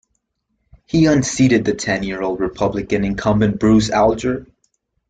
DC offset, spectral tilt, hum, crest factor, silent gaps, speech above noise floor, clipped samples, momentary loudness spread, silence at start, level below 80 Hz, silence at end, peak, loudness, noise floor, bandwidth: under 0.1%; -5.5 dB/octave; none; 14 dB; none; 55 dB; under 0.1%; 8 LU; 0.95 s; -40 dBFS; 0.65 s; -2 dBFS; -17 LUFS; -71 dBFS; 9.4 kHz